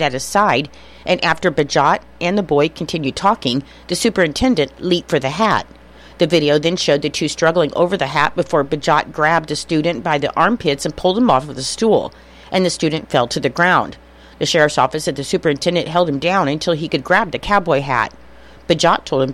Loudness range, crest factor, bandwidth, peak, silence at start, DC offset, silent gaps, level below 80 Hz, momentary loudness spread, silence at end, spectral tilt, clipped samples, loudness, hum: 1 LU; 16 dB; 15.5 kHz; -2 dBFS; 0 s; under 0.1%; none; -44 dBFS; 6 LU; 0 s; -4.5 dB/octave; under 0.1%; -17 LUFS; none